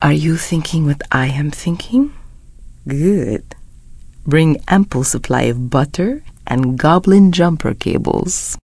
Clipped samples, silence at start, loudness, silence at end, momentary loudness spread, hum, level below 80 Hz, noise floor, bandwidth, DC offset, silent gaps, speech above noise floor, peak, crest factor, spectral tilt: under 0.1%; 0 s; -15 LUFS; 0.1 s; 10 LU; none; -34 dBFS; -37 dBFS; 11 kHz; under 0.1%; none; 22 dB; 0 dBFS; 16 dB; -6 dB/octave